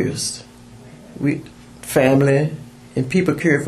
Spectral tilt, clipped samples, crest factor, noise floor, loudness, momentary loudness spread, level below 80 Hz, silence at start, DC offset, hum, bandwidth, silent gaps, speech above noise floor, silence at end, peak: -5.5 dB/octave; under 0.1%; 18 dB; -41 dBFS; -19 LUFS; 19 LU; -50 dBFS; 0 s; under 0.1%; none; 13.5 kHz; none; 24 dB; 0 s; 0 dBFS